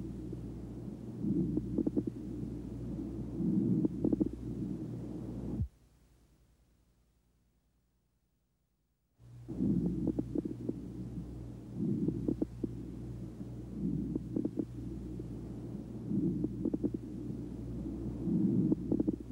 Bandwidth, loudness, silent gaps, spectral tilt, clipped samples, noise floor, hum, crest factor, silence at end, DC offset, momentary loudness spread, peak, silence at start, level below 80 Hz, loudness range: 11.5 kHz; -37 LUFS; none; -10.5 dB/octave; under 0.1%; -78 dBFS; 60 Hz at -55 dBFS; 20 dB; 0 s; under 0.1%; 12 LU; -18 dBFS; 0 s; -52 dBFS; 8 LU